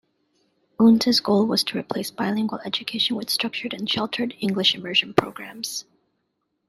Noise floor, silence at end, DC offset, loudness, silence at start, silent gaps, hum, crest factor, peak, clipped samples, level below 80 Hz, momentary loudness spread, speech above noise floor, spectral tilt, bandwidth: -75 dBFS; 0.85 s; under 0.1%; -22 LUFS; 0.8 s; none; none; 22 dB; -2 dBFS; under 0.1%; -64 dBFS; 12 LU; 52 dB; -4 dB/octave; 14 kHz